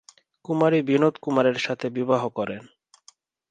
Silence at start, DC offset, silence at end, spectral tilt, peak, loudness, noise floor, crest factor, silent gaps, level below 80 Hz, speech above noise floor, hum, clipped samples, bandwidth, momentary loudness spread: 0.5 s; under 0.1%; 0.85 s; -6.5 dB/octave; -6 dBFS; -23 LUFS; -58 dBFS; 18 dB; none; -70 dBFS; 35 dB; none; under 0.1%; 9.4 kHz; 11 LU